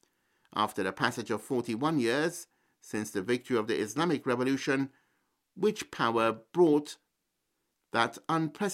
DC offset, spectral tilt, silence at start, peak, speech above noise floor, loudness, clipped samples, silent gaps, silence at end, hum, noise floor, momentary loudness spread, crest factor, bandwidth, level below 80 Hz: under 0.1%; -5 dB/octave; 0.55 s; -10 dBFS; 52 dB; -30 LUFS; under 0.1%; none; 0 s; none; -81 dBFS; 9 LU; 22 dB; 15.5 kHz; -74 dBFS